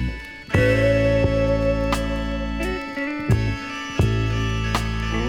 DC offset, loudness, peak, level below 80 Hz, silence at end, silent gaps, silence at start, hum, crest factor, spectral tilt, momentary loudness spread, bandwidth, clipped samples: under 0.1%; -22 LUFS; -6 dBFS; -30 dBFS; 0 s; none; 0 s; none; 16 dB; -6.5 dB/octave; 9 LU; 15.5 kHz; under 0.1%